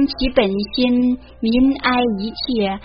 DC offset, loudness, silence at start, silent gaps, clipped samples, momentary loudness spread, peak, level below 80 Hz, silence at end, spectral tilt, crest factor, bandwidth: under 0.1%; -18 LUFS; 0 s; none; under 0.1%; 6 LU; 0 dBFS; -36 dBFS; 0 s; -3.5 dB/octave; 16 dB; 5.4 kHz